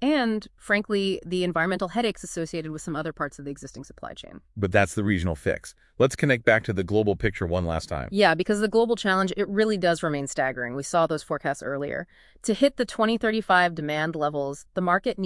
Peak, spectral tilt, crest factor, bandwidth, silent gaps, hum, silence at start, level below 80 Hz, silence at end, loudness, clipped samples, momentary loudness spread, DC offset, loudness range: -6 dBFS; -5 dB/octave; 20 dB; 12 kHz; none; none; 0 s; -50 dBFS; 0 s; -25 LUFS; under 0.1%; 12 LU; under 0.1%; 5 LU